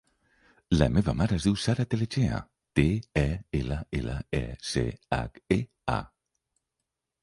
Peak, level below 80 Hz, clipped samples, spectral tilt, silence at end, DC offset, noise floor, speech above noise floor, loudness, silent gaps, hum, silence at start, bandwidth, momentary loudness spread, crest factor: -6 dBFS; -40 dBFS; under 0.1%; -6.5 dB/octave; 1.15 s; under 0.1%; -85 dBFS; 58 dB; -29 LUFS; none; none; 0.7 s; 11.5 kHz; 7 LU; 22 dB